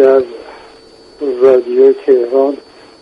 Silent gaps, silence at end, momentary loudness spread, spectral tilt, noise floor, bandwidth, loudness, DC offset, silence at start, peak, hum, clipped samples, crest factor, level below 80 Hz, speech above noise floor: none; 0.45 s; 16 LU; -6.5 dB/octave; -40 dBFS; 5.4 kHz; -11 LUFS; under 0.1%; 0 s; 0 dBFS; none; under 0.1%; 12 dB; -58 dBFS; 30 dB